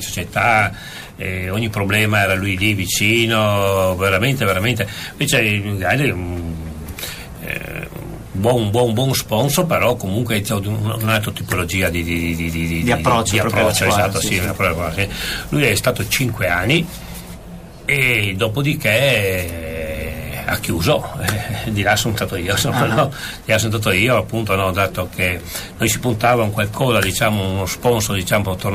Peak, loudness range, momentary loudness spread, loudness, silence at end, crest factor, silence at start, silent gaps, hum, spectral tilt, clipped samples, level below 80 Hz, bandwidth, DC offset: -2 dBFS; 3 LU; 11 LU; -18 LUFS; 0 s; 16 dB; 0 s; none; none; -4.5 dB/octave; under 0.1%; -38 dBFS; 15.5 kHz; under 0.1%